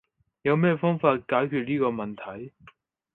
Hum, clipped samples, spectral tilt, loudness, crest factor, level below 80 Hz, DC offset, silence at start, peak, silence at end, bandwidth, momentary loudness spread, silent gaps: none; under 0.1%; -10 dB/octave; -25 LUFS; 20 dB; -66 dBFS; under 0.1%; 0.45 s; -6 dBFS; 0.65 s; 4.1 kHz; 16 LU; none